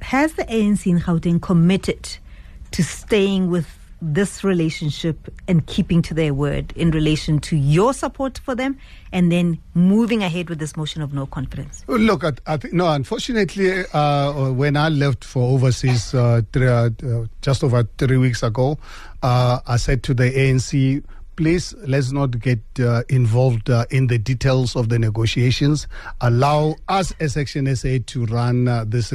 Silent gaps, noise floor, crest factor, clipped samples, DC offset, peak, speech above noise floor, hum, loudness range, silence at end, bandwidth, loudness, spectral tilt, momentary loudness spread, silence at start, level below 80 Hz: none; -38 dBFS; 14 dB; under 0.1%; under 0.1%; -6 dBFS; 20 dB; none; 2 LU; 0 s; 13 kHz; -19 LUFS; -6.5 dB/octave; 9 LU; 0 s; -36 dBFS